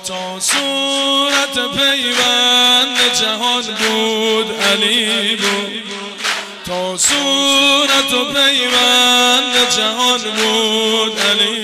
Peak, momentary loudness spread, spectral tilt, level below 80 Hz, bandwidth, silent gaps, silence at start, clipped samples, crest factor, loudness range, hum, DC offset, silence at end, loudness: -4 dBFS; 10 LU; -1 dB/octave; -54 dBFS; 16 kHz; none; 0 s; under 0.1%; 10 dB; 4 LU; none; under 0.1%; 0 s; -12 LUFS